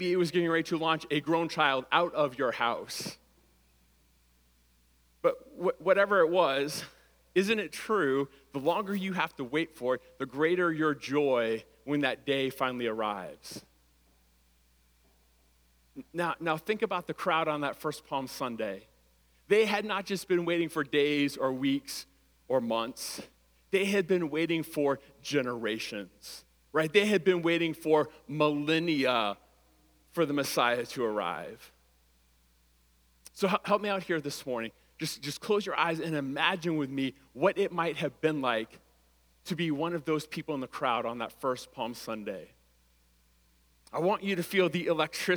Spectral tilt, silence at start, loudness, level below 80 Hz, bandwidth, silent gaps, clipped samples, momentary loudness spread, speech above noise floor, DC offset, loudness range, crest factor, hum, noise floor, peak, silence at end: -5 dB/octave; 0 s; -30 LUFS; -68 dBFS; over 20 kHz; none; under 0.1%; 11 LU; 36 dB; under 0.1%; 7 LU; 24 dB; none; -66 dBFS; -8 dBFS; 0 s